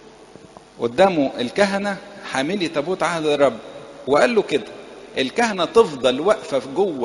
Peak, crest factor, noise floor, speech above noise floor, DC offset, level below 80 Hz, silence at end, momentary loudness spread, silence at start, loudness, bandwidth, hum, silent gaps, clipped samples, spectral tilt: 0 dBFS; 20 dB; -44 dBFS; 25 dB; under 0.1%; -56 dBFS; 0 s; 13 LU; 0.75 s; -20 LUFS; 11.5 kHz; none; none; under 0.1%; -4.5 dB/octave